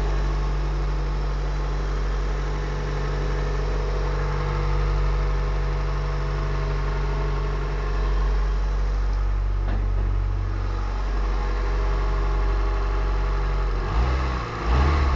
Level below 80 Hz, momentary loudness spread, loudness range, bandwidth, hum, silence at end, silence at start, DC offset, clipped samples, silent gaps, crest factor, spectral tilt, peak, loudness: -24 dBFS; 3 LU; 2 LU; 7 kHz; none; 0 s; 0 s; 0.1%; under 0.1%; none; 12 dB; -7 dB/octave; -10 dBFS; -26 LUFS